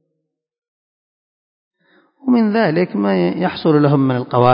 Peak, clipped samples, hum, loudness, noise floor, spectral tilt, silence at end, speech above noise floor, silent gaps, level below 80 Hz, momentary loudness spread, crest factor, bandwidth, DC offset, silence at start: 0 dBFS; under 0.1%; none; -16 LUFS; -74 dBFS; -11.5 dB/octave; 0 s; 60 dB; none; -60 dBFS; 5 LU; 18 dB; 5.4 kHz; under 0.1%; 2.25 s